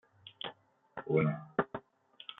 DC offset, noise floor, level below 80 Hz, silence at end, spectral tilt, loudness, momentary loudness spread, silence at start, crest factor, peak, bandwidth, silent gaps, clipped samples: under 0.1%; -60 dBFS; -72 dBFS; 0.05 s; -5.5 dB/octave; -35 LUFS; 19 LU; 0.25 s; 22 dB; -14 dBFS; 4 kHz; none; under 0.1%